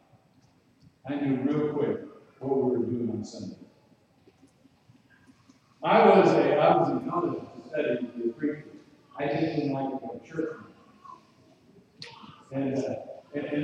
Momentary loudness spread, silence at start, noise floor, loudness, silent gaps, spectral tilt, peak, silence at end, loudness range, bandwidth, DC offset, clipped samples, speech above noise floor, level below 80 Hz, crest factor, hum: 21 LU; 1.05 s; -62 dBFS; -27 LUFS; none; -7.5 dB/octave; -6 dBFS; 0 s; 13 LU; 8.6 kHz; under 0.1%; under 0.1%; 37 dB; -72 dBFS; 22 dB; none